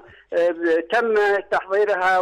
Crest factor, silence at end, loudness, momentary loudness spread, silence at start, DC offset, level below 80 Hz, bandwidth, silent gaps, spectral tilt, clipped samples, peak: 8 dB; 0 s; -20 LUFS; 4 LU; 0.3 s; under 0.1%; -62 dBFS; 11.5 kHz; none; -4 dB/octave; under 0.1%; -12 dBFS